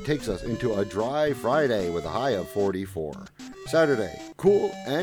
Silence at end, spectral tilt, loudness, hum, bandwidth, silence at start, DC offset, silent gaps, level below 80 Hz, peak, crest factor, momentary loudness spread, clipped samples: 0 s; -6 dB/octave; -26 LUFS; none; 19 kHz; 0 s; under 0.1%; none; -50 dBFS; -8 dBFS; 16 dB; 12 LU; under 0.1%